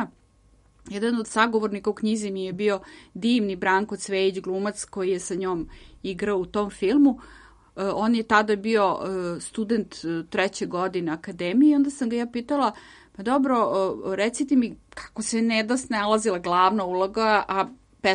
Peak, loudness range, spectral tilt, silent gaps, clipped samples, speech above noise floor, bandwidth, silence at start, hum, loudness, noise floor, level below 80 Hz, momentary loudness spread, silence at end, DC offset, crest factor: -4 dBFS; 3 LU; -4.5 dB/octave; none; under 0.1%; 34 dB; 11.5 kHz; 0 s; none; -24 LUFS; -58 dBFS; -56 dBFS; 10 LU; 0 s; under 0.1%; 20 dB